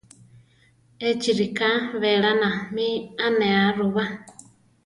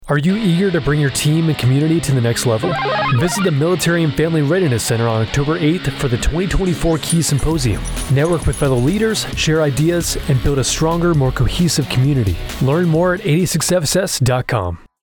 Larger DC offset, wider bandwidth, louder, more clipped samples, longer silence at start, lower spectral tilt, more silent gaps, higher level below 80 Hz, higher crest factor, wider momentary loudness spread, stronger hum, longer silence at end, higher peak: neither; second, 11.5 kHz vs over 20 kHz; second, -22 LUFS vs -16 LUFS; neither; first, 1 s vs 0 s; about the same, -5 dB/octave vs -5 dB/octave; neither; second, -64 dBFS vs -28 dBFS; first, 16 dB vs 10 dB; first, 7 LU vs 3 LU; neither; first, 0.55 s vs 0.25 s; about the same, -8 dBFS vs -6 dBFS